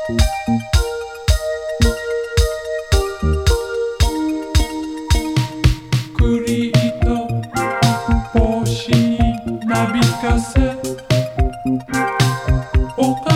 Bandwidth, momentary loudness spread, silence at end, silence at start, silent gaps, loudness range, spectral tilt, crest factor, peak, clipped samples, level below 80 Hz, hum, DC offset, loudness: 16.5 kHz; 5 LU; 0 s; 0 s; none; 2 LU; -5.5 dB/octave; 16 dB; 0 dBFS; under 0.1%; -22 dBFS; none; under 0.1%; -18 LUFS